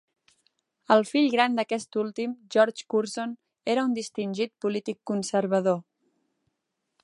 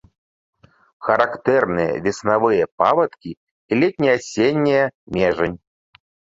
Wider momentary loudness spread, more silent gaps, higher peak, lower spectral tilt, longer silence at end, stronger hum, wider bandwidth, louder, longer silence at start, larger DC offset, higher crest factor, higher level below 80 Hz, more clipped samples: first, 10 LU vs 7 LU; second, none vs 2.72-2.78 s, 3.37-3.69 s, 4.95-5.07 s; second, -6 dBFS vs -2 dBFS; about the same, -5 dB/octave vs -6 dB/octave; first, 1.25 s vs 0.85 s; neither; first, 11.5 kHz vs 7.8 kHz; second, -26 LUFS vs -19 LUFS; about the same, 0.9 s vs 1 s; neither; about the same, 22 dB vs 18 dB; second, -80 dBFS vs -52 dBFS; neither